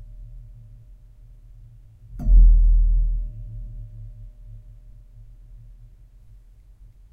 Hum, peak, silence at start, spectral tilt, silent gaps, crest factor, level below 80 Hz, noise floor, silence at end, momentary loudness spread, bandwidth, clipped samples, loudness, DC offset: none; -4 dBFS; 0.2 s; -11 dB/octave; none; 18 dB; -22 dBFS; -48 dBFS; 2.55 s; 28 LU; 0.8 kHz; under 0.1%; -21 LUFS; under 0.1%